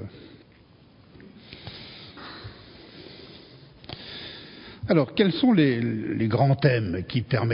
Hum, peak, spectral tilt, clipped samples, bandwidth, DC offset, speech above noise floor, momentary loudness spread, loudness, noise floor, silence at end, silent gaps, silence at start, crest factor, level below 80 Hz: none; -6 dBFS; -11.5 dB/octave; under 0.1%; 5.4 kHz; under 0.1%; 32 dB; 24 LU; -23 LUFS; -54 dBFS; 0 s; none; 0 s; 22 dB; -52 dBFS